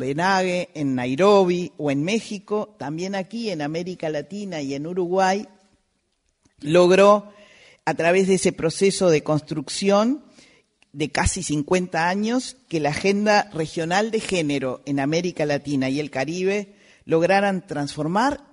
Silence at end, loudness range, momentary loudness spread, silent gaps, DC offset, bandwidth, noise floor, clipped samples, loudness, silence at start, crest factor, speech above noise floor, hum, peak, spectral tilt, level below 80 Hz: 0.15 s; 6 LU; 10 LU; none; under 0.1%; 11 kHz; -70 dBFS; under 0.1%; -22 LUFS; 0 s; 20 dB; 49 dB; none; -2 dBFS; -5 dB/octave; -48 dBFS